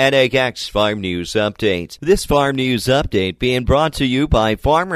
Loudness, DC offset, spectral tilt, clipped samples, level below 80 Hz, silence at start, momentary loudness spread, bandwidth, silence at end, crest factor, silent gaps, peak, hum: -17 LUFS; under 0.1%; -5 dB/octave; under 0.1%; -30 dBFS; 0 s; 5 LU; 15 kHz; 0 s; 14 dB; none; -2 dBFS; none